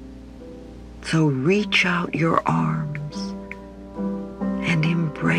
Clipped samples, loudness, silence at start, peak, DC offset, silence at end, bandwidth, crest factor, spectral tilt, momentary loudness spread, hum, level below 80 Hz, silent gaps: under 0.1%; -22 LUFS; 0 s; -2 dBFS; under 0.1%; 0 s; 10.5 kHz; 22 dB; -6 dB/octave; 22 LU; none; -46 dBFS; none